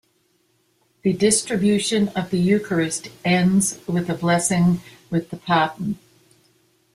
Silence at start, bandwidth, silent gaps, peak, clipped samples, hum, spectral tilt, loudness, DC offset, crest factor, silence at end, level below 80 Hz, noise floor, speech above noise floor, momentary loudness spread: 1.05 s; 14 kHz; none; -4 dBFS; under 0.1%; none; -4.5 dB/octave; -21 LUFS; under 0.1%; 18 dB; 1 s; -56 dBFS; -65 dBFS; 45 dB; 9 LU